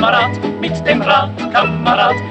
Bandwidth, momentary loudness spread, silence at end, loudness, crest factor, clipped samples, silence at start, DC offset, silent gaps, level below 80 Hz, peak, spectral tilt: 8.8 kHz; 6 LU; 0 s; -14 LUFS; 14 dB; under 0.1%; 0 s; under 0.1%; none; -46 dBFS; 0 dBFS; -6 dB/octave